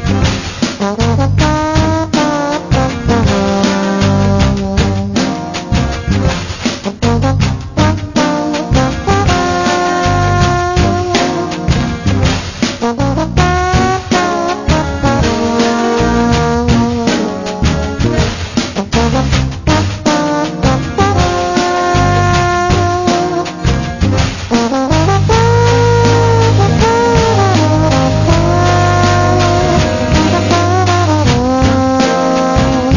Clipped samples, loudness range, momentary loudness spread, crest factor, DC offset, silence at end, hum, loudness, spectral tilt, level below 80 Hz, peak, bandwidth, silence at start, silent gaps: under 0.1%; 4 LU; 5 LU; 10 dB; under 0.1%; 0 s; none; -12 LUFS; -5.5 dB/octave; -22 dBFS; 0 dBFS; 7.4 kHz; 0 s; none